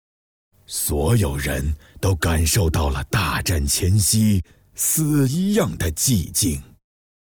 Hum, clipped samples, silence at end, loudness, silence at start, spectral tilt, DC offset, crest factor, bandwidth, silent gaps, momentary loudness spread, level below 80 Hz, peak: none; under 0.1%; 0.65 s; -20 LUFS; 0.7 s; -4.5 dB/octave; under 0.1%; 14 dB; over 20 kHz; none; 7 LU; -32 dBFS; -8 dBFS